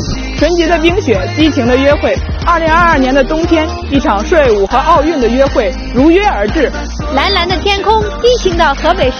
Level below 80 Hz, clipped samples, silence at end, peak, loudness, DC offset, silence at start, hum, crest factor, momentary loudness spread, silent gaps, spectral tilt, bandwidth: -20 dBFS; 0.3%; 0 s; 0 dBFS; -10 LUFS; under 0.1%; 0 s; none; 10 dB; 6 LU; none; -5.5 dB/octave; 6.8 kHz